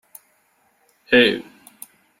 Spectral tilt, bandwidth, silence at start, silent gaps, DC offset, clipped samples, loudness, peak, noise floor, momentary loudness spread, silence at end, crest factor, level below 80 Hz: -4 dB/octave; 16 kHz; 1.1 s; none; under 0.1%; under 0.1%; -17 LUFS; -2 dBFS; -63 dBFS; 27 LU; 0.8 s; 22 dB; -64 dBFS